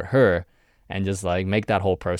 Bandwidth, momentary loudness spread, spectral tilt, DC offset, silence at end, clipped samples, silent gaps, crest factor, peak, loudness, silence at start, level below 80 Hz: 12.5 kHz; 9 LU; -6.5 dB/octave; under 0.1%; 0 s; under 0.1%; none; 16 dB; -6 dBFS; -23 LUFS; 0 s; -48 dBFS